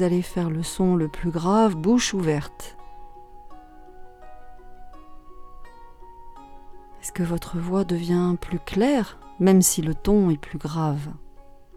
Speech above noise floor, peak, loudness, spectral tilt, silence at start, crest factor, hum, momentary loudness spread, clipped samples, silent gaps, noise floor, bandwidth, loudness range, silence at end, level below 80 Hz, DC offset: 22 dB; -4 dBFS; -23 LUFS; -5.5 dB/octave; 0 s; 20 dB; none; 12 LU; under 0.1%; none; -44 dBFS; 15.5 kHz; 13 LU; 0.15 s; -42 dBFS; under 0.1%